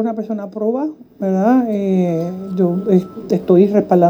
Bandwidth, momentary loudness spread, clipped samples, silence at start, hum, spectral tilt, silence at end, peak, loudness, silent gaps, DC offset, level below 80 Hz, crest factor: 14 kHz; 11 LU; under 0.1%; 0 s; none; -9.5 dB/octave; 0 s; 0 dBFS; -17 LUFS; none; under 0.1%; -58 dBFS; 14 dB